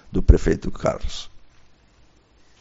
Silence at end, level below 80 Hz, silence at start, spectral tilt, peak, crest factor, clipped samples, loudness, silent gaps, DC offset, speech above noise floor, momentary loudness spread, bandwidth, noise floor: 1.25 s; -24 dBFS; 0.1 s; -7 dB/octave; 0 dBFS; 22 dB; under 0.1%; -22 LUFS; none; under 0.1%; 36 dB; 17 LU; 7.8 kHz; -55 dBFS